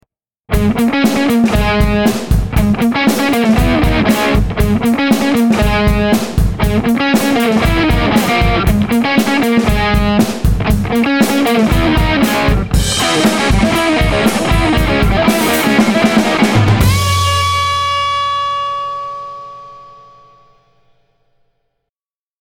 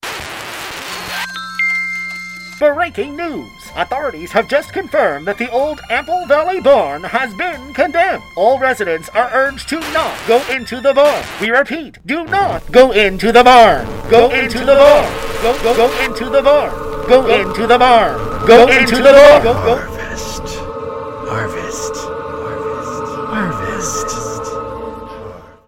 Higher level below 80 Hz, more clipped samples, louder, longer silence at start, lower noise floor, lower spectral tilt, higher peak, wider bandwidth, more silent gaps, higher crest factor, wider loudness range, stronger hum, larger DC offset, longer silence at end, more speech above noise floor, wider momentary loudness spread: first, -22 dBFS vs -34 dBFS; second, under 0.1% vs 1%; about the same, -12 LUFS vs -13 LUFS; first, 0.5 s vs 0.05 s; first, under -90 dBFS vs -33 dBFS; first, -5.5 dB/octave vs -4 dB/octave; about the same, 0 dBFS vs 0 dBFS; first, 19 kHz vs 16.5 kHz; neither; about the same, 12 dB vs 14 dB; second, 5 LU vs 12 LU; neither; neither; first, 2.55 s vs 0.2 s; first, over 78 dB vs 21 dB; second, 4 LU vs 17 LU